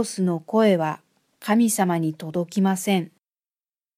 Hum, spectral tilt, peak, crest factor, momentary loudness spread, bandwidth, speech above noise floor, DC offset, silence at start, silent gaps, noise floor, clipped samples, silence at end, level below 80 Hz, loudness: none; -5.5 dB/octave; -6 dBFS; 18 dB; 10 LU; 16 kHz; over 68 dB; under 0.1%; 0 s; none; under -90 dBFS; under 0.1%; 0.9 s; -74 dBFS; -22 LUFS